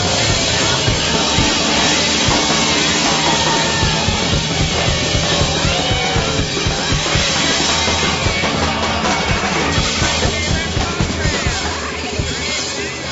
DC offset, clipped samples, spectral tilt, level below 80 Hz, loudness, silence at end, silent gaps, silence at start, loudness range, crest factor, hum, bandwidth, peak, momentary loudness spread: under 0.1%; under 0.1%; -3 dB/octave; -28 dBFS; -15 LUFS; 0 s; none; 0 s; 3 LU; 14 dB; none; 8.2 kHz; -2 dBFS; 5 LU